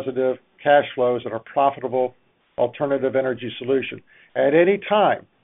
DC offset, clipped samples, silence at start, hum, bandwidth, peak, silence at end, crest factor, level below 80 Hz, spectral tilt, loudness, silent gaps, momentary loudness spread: under 0.1%; under 0.1%; 0 s; none; 3.9 kHz; -4 dBFS; 0.25 s; 18 dB; -66 dBFS; -3.5 dB/octave; -21 LUFS; none; 10 LU